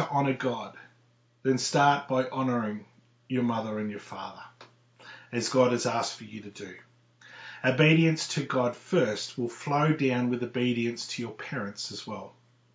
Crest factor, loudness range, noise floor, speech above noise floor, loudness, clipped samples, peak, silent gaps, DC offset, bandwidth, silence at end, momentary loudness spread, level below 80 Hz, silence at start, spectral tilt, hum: 22 dB; 5 LU; -65 dBFS; 37 dB; -28 LUFS; under 0.1%; -8 dBFS; none; under 0.1%; 8 kHz; 0.45 s; 18 LU; -74 dBFS; 0 s; -5 dB/octave; none